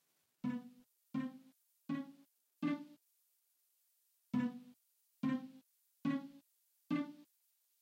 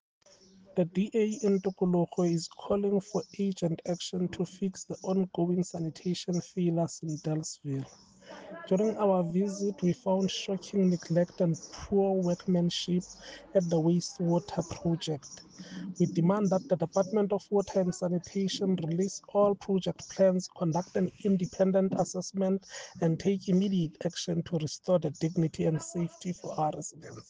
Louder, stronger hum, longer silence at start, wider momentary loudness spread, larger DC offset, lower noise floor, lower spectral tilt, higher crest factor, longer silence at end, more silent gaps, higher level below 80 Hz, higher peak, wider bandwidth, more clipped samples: second, -43 LUFS vs -30 LUFS; neither; second, 0.45 s vs 0.75 s; first, 18 LU vs 9 LU; neither; first, -79 dBFS vs -58 dBFS; about the same, -7.5 dB/octave vs -6.5 dB/octave; about the same, 18 dB vs 16 dB; first, 0.6 s vs 0.1 s; neither; second, -86 dBFS vs -64 dBFS; second, -28 dBFS vs -14 dBFS; first, 16 kHz vs 9.6 kHz; neither